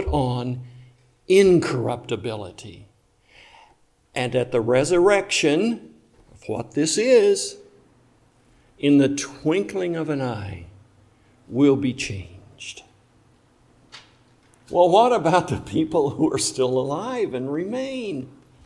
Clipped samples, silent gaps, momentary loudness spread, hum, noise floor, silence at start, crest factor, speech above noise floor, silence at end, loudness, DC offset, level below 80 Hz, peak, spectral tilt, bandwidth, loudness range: under 0.1%; none; 18 LU; none; -58 dBFS; 0 s; 20 dB; 38 dB; 0.35 s; -21 LUFS; under 0.1%; -48 dBFS; -2 dBFS; -5 dB/octave; 12 kHz; 6 LU